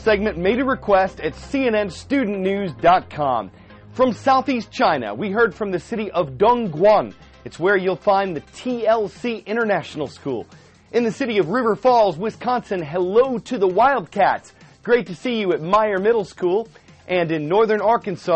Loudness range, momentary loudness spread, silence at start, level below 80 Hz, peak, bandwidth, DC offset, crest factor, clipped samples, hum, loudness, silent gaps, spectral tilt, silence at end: 3 LU; 10 LU; 0 s; -48 dBFS; -6 dBFS; 8.4 kHz; under 0.1%; 14 dB; under 0.1%; none; -20 LUFS; none; -6 dB/octave; 0 s